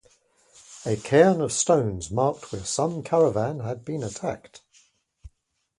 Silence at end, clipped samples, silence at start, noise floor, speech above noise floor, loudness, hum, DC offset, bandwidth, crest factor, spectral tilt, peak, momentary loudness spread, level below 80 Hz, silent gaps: 0.5 s; under 0.1%; 0.7 s; -73 dBFS; 49 dB; -24 LUFS; none; under 0.1%; 11.5 kHz; 22 dB; -5 dB/octave; -4 dBFS; 14 LU; -54 dBFS; none